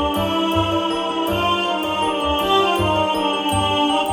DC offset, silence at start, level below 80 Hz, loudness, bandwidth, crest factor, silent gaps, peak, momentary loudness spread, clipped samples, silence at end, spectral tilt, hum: under 0.1%; 0 s; -40 dBFS; -19 LUFS; over 20 kHz; 14 dB; none; -6 dBFS; 4 LU; under 0.1%; 0 s; -4.5 dB/octave; none